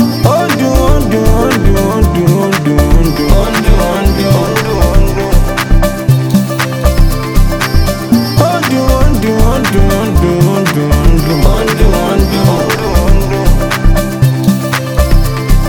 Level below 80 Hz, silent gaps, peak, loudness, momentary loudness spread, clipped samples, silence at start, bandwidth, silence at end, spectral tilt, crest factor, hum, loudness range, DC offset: -12 dBFS; none; 0 dBFS; -11 LUFS; 3 LU; 2%; 0 s; 19.5 kHz; 0 s; -6 dB/octave; 8 dB; none; 1 LU; under 0.1%